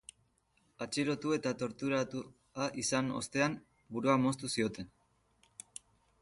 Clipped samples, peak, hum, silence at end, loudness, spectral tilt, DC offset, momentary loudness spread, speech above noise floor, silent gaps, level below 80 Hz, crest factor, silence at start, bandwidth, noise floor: under 0.1%; -16 dBFS; none; 1.35 s; -35 LUFS; -4.5 dB/octave; under 0.1%; 20 LU; 40 dB; none; -70 dBFS; 20 dB; 0.8 s; 11.5 kHz; -74 dBFS